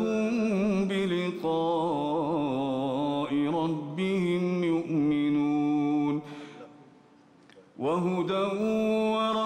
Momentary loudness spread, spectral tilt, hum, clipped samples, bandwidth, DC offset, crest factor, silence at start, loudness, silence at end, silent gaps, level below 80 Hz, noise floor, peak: 5 LU; -7 dB/octave; none; under 0.1%; 10 kHz; under 0.1%; 8 dB; 0 s; -28 LUFS; 0 s; none; -66 dBFS; -57 dBFS; -18 dBFS